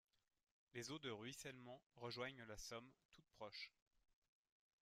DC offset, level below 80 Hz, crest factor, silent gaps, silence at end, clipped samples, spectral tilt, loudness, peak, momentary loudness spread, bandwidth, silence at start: under 0.1%; -78 dBFS; 20 dB; 1.86-1.90 s, 3.05-3.09 s; 1.1 s; under 0.1%; -3.5 dB/octave; -55 LUFS; -38 dBFS; 9 LU; 15 kHz; 0.75 s